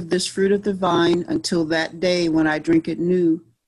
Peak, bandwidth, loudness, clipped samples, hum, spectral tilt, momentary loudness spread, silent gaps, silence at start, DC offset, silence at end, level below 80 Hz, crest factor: -8 dBFS; 12 kHz; -20 LUFS; under 0.1%; none; -5 dB/octave; 3 LU; none; 0 s; under 0.1%; 0.3 s; -54 dBFS; 12 dB